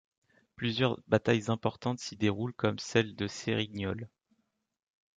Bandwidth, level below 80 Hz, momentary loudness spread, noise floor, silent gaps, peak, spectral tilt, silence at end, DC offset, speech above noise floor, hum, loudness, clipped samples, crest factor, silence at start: 9.2 kHz; -60 dBFS; 8 LU; -75 dBFS; none; -12 dBFS; -5.5 dB/octave; 1.1 s; under 0.1%; 44 dB; none; -32 LUFS; under 0.1%; 22 dB; 0.6 s